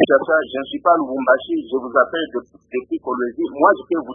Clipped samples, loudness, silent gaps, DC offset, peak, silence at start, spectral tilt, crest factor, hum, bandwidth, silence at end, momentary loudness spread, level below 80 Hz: under 0.1%; -19 LUFS; none; under 0.1%; 0 dBFS; 0 s; -8 dB/octave; 18 dB; none; 3.7 kHz; 0 s; 10 LU; -60 dBFS